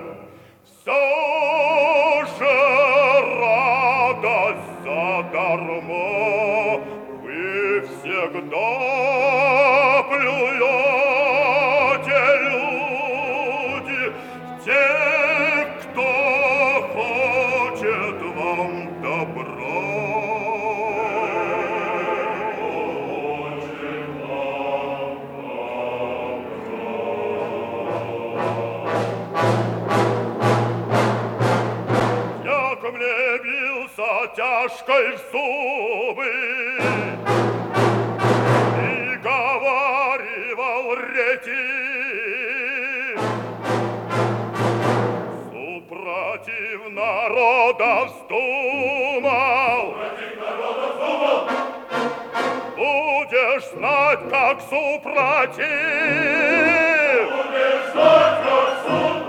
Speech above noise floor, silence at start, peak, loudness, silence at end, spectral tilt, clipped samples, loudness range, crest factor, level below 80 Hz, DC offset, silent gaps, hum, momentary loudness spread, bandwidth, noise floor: 27 dB; 0 s; -2 dBFS; -20 LUFS; 0 s; -5.5 dB/octave; under 0.1%; 8 LU; 18 dB; -64 dBFS; under 0.1%; none; none; 10 LU; 16.5 kHz; -49 dBFS